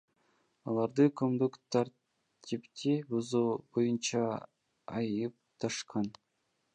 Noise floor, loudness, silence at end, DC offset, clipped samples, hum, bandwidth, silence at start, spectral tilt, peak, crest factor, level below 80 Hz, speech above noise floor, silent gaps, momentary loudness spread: -79 dBFS; -34 LUFS; 0.65 s; under 0.1%; under 0.1%; none; 10 kHz; 0.65 s; -5.5 dB/octave; -14 dBFS; 20 dB; -76 dBFS; 47 dB; none; 13 LU